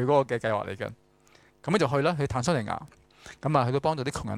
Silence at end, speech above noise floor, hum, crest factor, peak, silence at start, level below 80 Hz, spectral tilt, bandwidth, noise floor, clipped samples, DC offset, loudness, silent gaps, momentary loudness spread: 0 s; 33 dB; none; 18 dB; -8 dBFS; 0 s; -54 dBFS; -6 dB/octave; 13 kHz; -60 dBFS; under 0.1%; under 0.1%; -28 LUFS; none; 12 LU